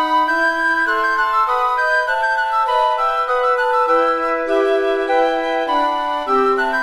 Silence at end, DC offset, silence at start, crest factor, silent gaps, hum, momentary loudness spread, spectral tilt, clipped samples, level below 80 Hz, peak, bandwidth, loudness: 0 s; under 0.1%; 0 s; 12 dB; none; none; 3 LU; -2.5 dB/octave; under 0.1%; -50 dBFS; -4 dBFS; 13.5 kHz; -16 LUFS